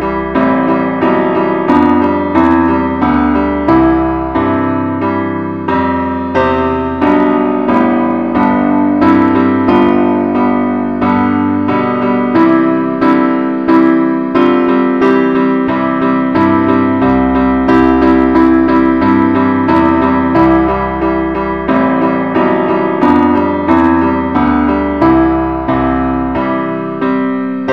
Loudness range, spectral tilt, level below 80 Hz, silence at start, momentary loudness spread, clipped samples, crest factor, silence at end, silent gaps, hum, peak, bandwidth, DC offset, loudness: 3 LU; -9 dB/octave; -32 dBFS; 0 s; 5 LU; under 0.1%; 10 dB; 0 s; none; none; 0 dBFS; 5.6 kHz; 0.5%; -11 LUFS